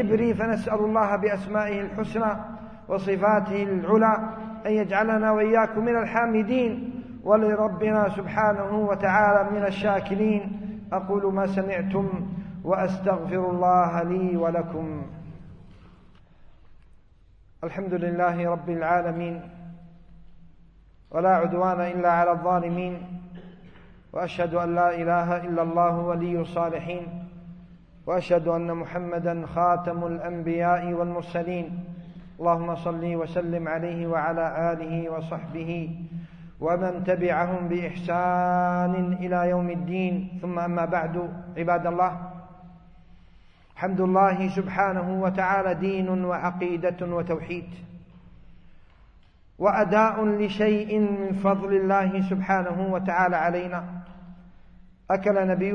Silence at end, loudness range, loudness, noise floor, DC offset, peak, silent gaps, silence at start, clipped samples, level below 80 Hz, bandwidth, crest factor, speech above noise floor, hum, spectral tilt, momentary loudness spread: 0 s; 6 LU; -25 LUFS; -54 dBFS; under 0.1%; -6 dBFS; none; 0 s; under 0.1%; -54 dBFS; 6.6 kHz; 18 dB; 30 dB; none; -8.5 dB/octave; 13 LU